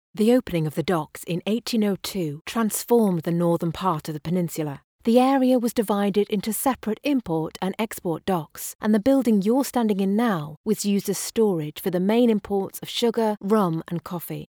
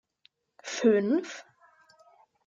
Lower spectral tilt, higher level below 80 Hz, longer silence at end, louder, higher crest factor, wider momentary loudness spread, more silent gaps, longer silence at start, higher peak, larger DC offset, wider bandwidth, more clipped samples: about the same, -5.5 dB/octave vs -5 dB/octave; first, -58 dBFS vs -82 dBFS; second, 0.1 s vs 1.05 s; first, -23 LUFS vs -27 LUFS; about the same, 16 dB vs 20 dB; second, 9 LU vs 21 LU; first, 2.41-2.45 s, 4.84-4.99 s, 8.75-8.79 s, 10.57-10.64 s vs none; second, 0.15 s vs 0.65 s; first, -6 dBFS vs -10 dBFS; neither; first, over 20 kHz vs 7.8 kHz; neither